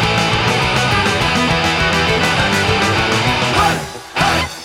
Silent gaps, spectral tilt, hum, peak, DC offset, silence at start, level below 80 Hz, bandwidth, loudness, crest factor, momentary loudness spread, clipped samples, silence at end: none; -4 dB/octave; none; 0 dBFS; under 0.1%; 0 s; -32 dBFS; 16.5 kHz; -14 LUFS; 14 dB; 2 LU; under 0.1%; 0 s